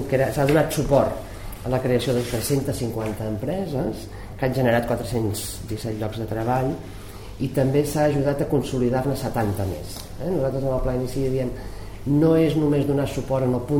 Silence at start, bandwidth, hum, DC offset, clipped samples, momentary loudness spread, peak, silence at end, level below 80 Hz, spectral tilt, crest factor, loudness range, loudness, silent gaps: 0 s; 16.5 kHz; none; 0.4%; under 0.1%; 13 LU; -4 dBFS; 0 s; -38 dBFS; -6.5 dB/octave; 18 dB; 3 LU; -23 LUFS; none